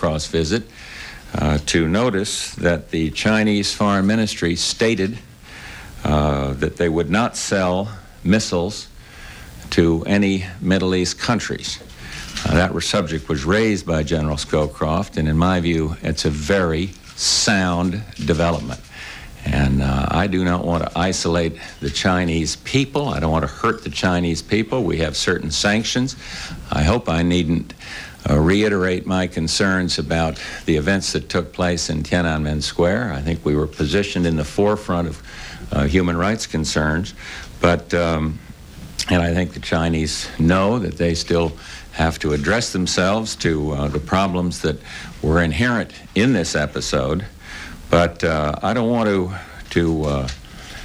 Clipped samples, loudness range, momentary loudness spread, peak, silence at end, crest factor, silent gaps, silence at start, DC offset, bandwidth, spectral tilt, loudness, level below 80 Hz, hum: under 0.1%; 2 LU; 12 LU; 0 dBFS; 0 s; 20 dB; none; 0 s; under 0.1%; 16 kHz; -5 dB/octave; -20 LUFS; -34 dBFS; none